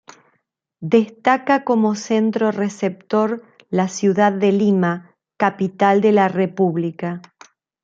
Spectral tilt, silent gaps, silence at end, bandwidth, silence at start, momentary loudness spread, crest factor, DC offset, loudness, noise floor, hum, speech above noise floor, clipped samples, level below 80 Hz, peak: -6.5 dB/octave; none; 0.65 s; 7.6 kHz; 0.8 s; 9 LU; 16 dB; under 0.1%; -18 LUFS; -69 dBFS; none; 52 dB; under 0.1%; -66 dBFS; -2 dBFS